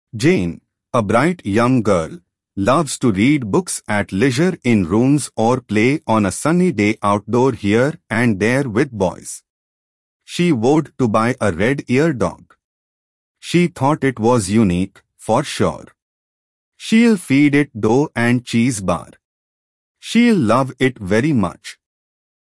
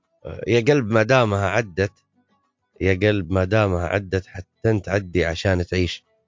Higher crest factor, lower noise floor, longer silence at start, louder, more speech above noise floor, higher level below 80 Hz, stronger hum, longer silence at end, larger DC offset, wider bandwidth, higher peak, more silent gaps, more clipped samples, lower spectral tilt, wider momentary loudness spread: about the same, 16 dB vs 18 dB; first, under -90 dBFS vs -68 dBFS; about the same, 0.15 s vs 0.25 s; first, -17 LUFS vs -21 LUFS; first, over 74 dB vs 47 dB; second, -52 dBFS vs -38 dBFS; neither; first, 0.85 s vs 0.3 s; neither; first, 12 kHz vs 7.6 kHz; about the same, -2 dBFS vs -2 dBFS; first, 9.50-10.20 s, 12.64-13.35 s, 16.02-16.72 s, 19.25-19.95 s vs none; neither; about the same, -6 dB/octave vs -6.5 dB/octave; about the same, 8 LU vs 9 LU